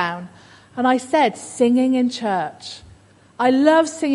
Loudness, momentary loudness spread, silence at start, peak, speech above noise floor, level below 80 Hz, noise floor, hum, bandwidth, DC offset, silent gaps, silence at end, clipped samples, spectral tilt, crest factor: -18 LUFS; 19 LU; 0 s; -2 dBFS; 32 dB; -60 dBFS; -49 dBFS; none; 11.5 kHz; under 0.1%; none; 0 s; under 0.1%; -4.5 dB/octave; 18 dB